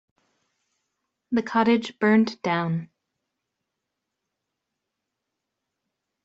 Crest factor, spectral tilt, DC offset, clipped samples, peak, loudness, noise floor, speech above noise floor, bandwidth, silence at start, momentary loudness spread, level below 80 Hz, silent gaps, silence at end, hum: 22 dB; -7 dB/octave; under 0.1%; under 0.1%; -8 dBFS; -23 LUFS; -83 dBFS; 61 dB; 7.8 kHz; 1.3 s; 8 LU; -70 dBFS; none; 3.4 s; none